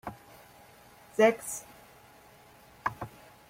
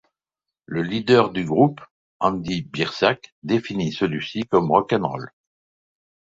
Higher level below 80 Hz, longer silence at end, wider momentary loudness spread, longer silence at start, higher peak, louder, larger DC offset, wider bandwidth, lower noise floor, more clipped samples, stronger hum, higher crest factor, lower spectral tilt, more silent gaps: second, -66 dBFS vs -56 dBFS; second, 0.4 s vs 1.05 s; first, 27 LU vs 11 LU; second, 0.05 s vs 0.7 s; second, -12 dBFS vs 0 dBFS; second, -30 LUFS vs -22 LUFS; neither; first, 16.5 kHz vs 8 kHz; second, -56 dBFS vs -87 dBFS; neither; neither; about the same, 22 dB vs 22 dB; second, -4 dB/octave vs -6.5 dB/octave; second, none vs 1.91-2.20 s, 3.32-3.42 s